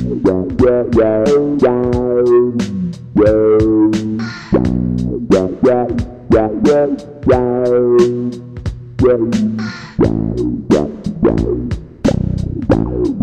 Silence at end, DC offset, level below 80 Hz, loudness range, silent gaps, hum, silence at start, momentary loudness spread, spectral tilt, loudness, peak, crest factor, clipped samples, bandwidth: 0 s; under 0.1%; -30 dBFS; 3 LU; none; none; 0 s; 10 LU; -8 dB/octave; -14 LUFS; 0 dBFS; 14 dB; under 0.1%; 9.2 kHz